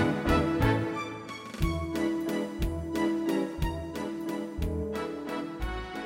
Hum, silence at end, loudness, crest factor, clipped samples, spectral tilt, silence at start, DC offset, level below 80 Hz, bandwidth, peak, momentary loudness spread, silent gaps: none; 0 s; -31 LUFS; 18 dB; under 0.1%; -6.5 dB/octave; 0 s; under 0.1%; -40 dBFS; 16.5 kHz; -12 dBFS; 9 LU; none